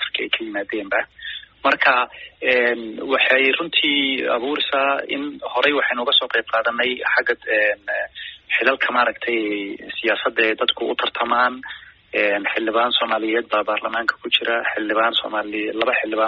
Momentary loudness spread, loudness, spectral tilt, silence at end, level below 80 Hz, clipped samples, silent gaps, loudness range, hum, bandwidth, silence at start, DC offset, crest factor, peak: 9 LU; -19 LUFS; 1.5 dB/octave; 0 s; -62 dBFS; under 0.1%; none; 3 LU; none; 7 kHz; 0 s; under 0.1%; 20 dB; 0 dBFS